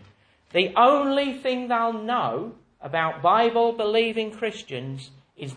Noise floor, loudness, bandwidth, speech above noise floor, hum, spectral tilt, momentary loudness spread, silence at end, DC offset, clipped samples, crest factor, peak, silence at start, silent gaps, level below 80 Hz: -56 dBFS; -23 LUFS; 10 kHz; 34 dB; none; -5.5 dB/octave; 16 LU; 0 s; under 0.1%; under 0.1%; 18 dB; -6 dBFS; 0.55 s; none; -66 dBFS